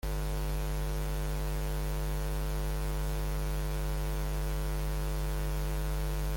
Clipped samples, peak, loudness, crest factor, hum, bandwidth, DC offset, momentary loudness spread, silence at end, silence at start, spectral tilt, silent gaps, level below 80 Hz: under 0.1%; -24 dBFS; -35 LUFS; 8 dB; none; 17 kHz; under 0.1%; 0 LU; 0 s; 0.05 s; -5.5 dB/octave; none; -34 dBFS